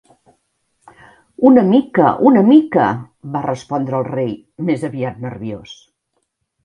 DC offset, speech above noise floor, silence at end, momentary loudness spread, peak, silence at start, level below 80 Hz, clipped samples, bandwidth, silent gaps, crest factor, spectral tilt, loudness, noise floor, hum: under 0.1%; 56 dB; 0.9 s; 16 LU; 0 dBFS; 1.4 s; -56 dBFS; under 0.1%; 10 kHz; none; 16 dB; -8 dB/octave; -15 LUFS; -70 dBFS; none